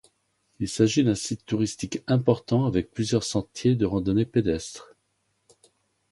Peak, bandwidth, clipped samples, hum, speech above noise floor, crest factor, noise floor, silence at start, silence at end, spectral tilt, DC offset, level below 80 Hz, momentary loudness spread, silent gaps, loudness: -6 dBFS; 11.5 kHz; under 0.1%; none; 49 dB; 20 dB; -73 dBFS; 0.6 s; 1.3 s; -6 dB/octave; under 0.1%; -50 dBFS; 9 LU; none; -25 LUFS